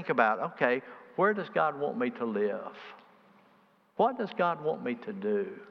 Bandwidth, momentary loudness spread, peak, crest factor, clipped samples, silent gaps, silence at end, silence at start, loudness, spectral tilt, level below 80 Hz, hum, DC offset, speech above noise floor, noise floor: 6.2 kHz; 12 LU; -10 dBFS; 22 dB; under 0.1%; none; 0 s; 0 s; -30 LUFS; -8 dB/octave; -88 dBFS; none; under 0.1%; 34 dB; -64 dBFS